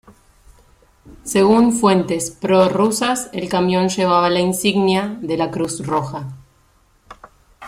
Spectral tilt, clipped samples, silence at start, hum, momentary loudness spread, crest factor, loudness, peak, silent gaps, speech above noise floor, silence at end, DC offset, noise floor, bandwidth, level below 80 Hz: -5 dB/octave; under 0.1%; 1.05 s; none; 9 LU; 16 dB; -17 LUFS; -2 dBFS; none; 39 dB; 0 s; under 0.1%; -56 dBFS; 16 kHz; -50 dBFS